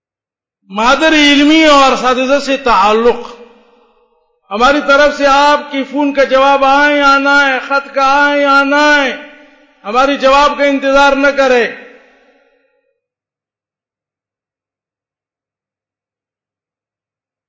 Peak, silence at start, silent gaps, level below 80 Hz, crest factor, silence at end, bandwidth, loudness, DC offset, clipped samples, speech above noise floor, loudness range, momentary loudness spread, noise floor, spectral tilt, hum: 0 dBFS; 0.7 s; none; -42 dBFS; 12 dB; 5.65 s; 8 kHz; -9 LUFS; under 0.1%; under 0.1%; 80 dB; 4 LU; 8 LU; -89 dBFS; -2.5 dB/octave; none